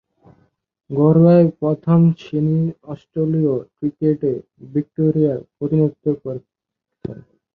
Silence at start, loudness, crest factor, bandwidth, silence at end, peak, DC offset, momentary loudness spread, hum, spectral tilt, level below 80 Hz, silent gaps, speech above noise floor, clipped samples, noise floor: 0.9 s; -18 LUFS; 16 dB; 4.6 kHz; 0.4 s; -2 dBFS; under 0.1%; 18 LU; none; -12 dB/octave; -56 dBFS; none; 64 dB; under 0.1%; -82 dBFS